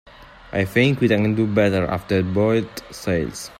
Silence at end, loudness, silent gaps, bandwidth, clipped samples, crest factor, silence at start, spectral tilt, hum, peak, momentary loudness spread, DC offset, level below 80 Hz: 0.1 s; -20 LUFS; none; 16 kHz; under 0.1%; 16 dB; 0.2 s; -6.5 dB/octave; none; -4 dBFS; 8 LU; under 0.1%; -48 dBFS